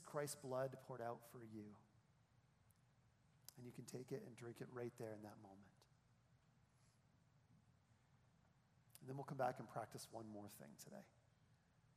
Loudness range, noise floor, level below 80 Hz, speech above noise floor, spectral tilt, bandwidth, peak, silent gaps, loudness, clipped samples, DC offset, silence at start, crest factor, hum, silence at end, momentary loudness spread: 7 LU; -77 dBFS; -90 dBFS; 25 dB; -5.5 dB/octave; 14.5 kHz; -30 dBFS; none; -53 LUFS; under 0.1%; under 0.1%; 0 s; 24 dB; none; 0.05 s; 17 LU